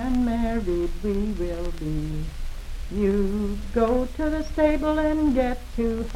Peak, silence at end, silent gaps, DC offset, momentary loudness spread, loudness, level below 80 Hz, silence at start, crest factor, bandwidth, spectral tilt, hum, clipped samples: -8 dBFS; 0 s; none; under 0.1%; 10 LU; -25 LUFS; -30 dBFS; 0 s; 16 dB; 14.5 kHz; -7.5 dB/octave; none; under 0.1%